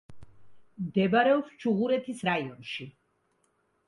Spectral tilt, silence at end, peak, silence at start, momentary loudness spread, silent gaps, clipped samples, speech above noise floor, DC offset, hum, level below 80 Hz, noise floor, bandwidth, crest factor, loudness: -6.5 dB/octave; 1 s; -12 dBFS; 0.1 s; 15 LU; none; under 0.1%; 45 dB; under 0.1%; none; -66 dBFS; -72 dBFS; 11.5 kHz; 18 dB; -28 LUFS